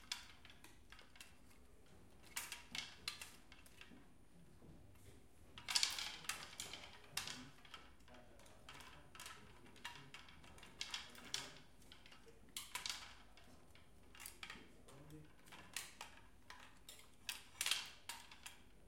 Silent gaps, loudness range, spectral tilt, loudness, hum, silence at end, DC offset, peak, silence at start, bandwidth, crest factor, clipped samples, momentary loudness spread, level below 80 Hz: none; 11 LU; 0 dB/octave; -48 LUFS; none; 0 s; under 0.1%; -14 dBFS; 0 s; 16.5 kHz; 38 dB; under 0.1%; 21 LU; -72 dBFS